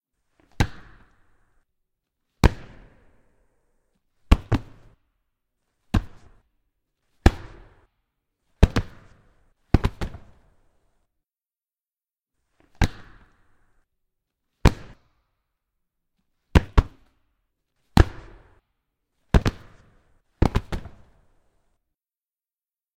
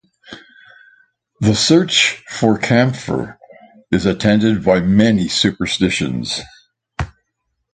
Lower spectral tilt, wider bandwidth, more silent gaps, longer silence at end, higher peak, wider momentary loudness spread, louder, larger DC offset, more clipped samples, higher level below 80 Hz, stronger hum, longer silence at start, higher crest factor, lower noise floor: first, -6.5 dB/octave vs -4.5 dB/octave; first, 16.5 kHz vs 9.4 kHz; neither; first, 2.2 s vs 0.7 s; about the same, 0 dBFS vs 0 dBFS; about the same, 16 LU vs 14 LU; second, -24 LUFS vs -15 LUFS; neither; neither; first, -32 dBFS vs -42 dBFS; neither; first, 0.6 s vs 0.3 s; first, 28 dB vs 18 dB; first, under -90 dBFS vs -72 dBFS